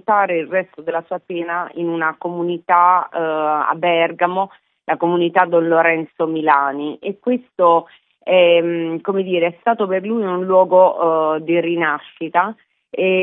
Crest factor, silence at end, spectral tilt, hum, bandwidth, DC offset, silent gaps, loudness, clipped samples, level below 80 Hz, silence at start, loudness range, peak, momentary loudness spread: 16 dB; 0 s; -10 dB/octave; none; 3.9 kHz; under 0.1%; none; -17 LUFS; under 0.1%; -76 dBFS; 0.1 s; 2 LU; 0 dBFS; 11 LU